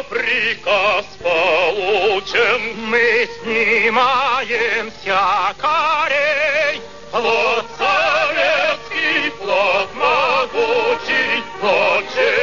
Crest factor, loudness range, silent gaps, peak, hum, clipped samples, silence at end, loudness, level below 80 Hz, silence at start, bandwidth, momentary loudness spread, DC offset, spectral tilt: 14 dB; 1 LU; none; -2 dBFS; none; under 0.1%; 0 s; -16 LUFS; -52 dBFS; 0 s; 7.4 kHz; 4 LU; 1%; -2.5 dB/octave